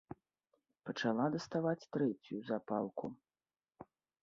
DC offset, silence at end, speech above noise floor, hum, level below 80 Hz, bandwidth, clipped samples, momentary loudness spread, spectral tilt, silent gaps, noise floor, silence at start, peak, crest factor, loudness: under 0.1%; 0.4 s; over 52 dB; none; -78 dBFS; 7.4 kHz; under 0.1%; 14 LU; -5.5 dB/octave; none; under -90 dBFS; 0.1 s; -22 dBFS; 20 dB; -39 LUFS